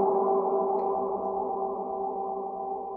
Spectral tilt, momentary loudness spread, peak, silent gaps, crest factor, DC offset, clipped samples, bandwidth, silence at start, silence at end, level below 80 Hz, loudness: -10.5 dB/octave; 8 LU; -14 dBFS; none; 14 dB; under 0.1%; under 0.1%; 2.4 kHz; 0 s; 0 s; -66 dBFS; -29 LUFS